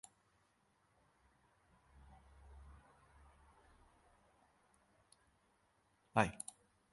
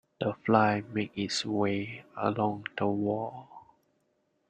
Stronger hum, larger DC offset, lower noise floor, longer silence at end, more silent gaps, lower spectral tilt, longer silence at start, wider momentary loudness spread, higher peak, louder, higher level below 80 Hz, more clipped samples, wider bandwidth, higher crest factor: neither; neither; about the same, -77 dBFS vs -75 dBFS; second, 0.55 s vs 0.9 s; neither; about the same, -5 dB/octave vs -5.5 dB/octave; first, 2.55 s vs 0.2 s; first, 28 LU vs 10 LU; second, -14 dBFS vs -8 dBFS; second, -40 LUFS vs -30 LUFS; about the same, -68 dBFS vs -68 dBFS; neither; first, 11.5 kHz vs 9.4 kHz; first, 34 dB vs 24 dB